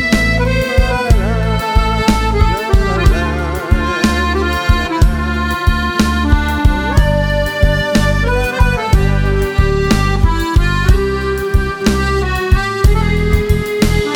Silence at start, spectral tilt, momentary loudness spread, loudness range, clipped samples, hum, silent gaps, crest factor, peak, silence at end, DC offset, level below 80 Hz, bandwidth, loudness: 0 s; -6 dB/octave; 3 LU; 1 LU; under 0.1%; none; none; 12 dB; 0 dBFS; 0 s; under 0.1%; -16 dBFS; 18.5 kHz; -14 LUFS